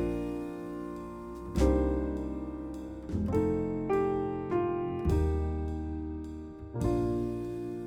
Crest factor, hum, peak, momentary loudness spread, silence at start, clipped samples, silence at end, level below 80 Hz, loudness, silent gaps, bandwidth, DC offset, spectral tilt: 18 dB; none; -14 dBFS; 11 LU; 0 s; under 0.1%; 0 s; -40 dBFS; -33 LUFS; none; 13 kHz; under 0.1%; -8.5 dB/octave